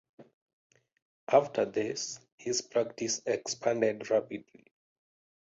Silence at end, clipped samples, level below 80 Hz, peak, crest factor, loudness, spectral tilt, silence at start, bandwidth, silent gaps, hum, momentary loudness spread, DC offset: 1.15 s; under 0.1%; -76 dBFS; -10 dBFS; 24 dB; -31 LUFS; -3 dB/octave; 0.2 s; 8 kHz; 0.34-0.47 s, 0.53-0.70 s, 1.02-1.27 s, 2.32-2.38 s; none; 13 LU; under 0.1%